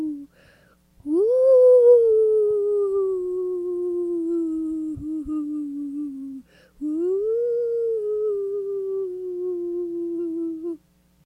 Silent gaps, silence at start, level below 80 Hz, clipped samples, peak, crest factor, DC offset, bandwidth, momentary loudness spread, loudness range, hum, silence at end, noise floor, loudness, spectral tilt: none; 0 s; -58 dBFS; under 0.1%; -6 dBFS; 16 dB; under 0.1%; 9.2 kHz; 17 LU; 9 LU; none; 0.5 s; -57 dBFS; -22 LUFS; -9 dB/octave